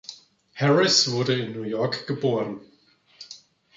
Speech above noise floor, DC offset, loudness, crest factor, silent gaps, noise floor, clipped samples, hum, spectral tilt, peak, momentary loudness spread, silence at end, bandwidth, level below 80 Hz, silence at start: 37 dB; under 0.1%; -23 LUFS; 20 dB; none; -60 dBFS; under 0.1%; none; -4 dB/octave; -4 dBFS; 24 LU; 0.4 s; 7.8 kHz; -72 dBFS; 0.1 s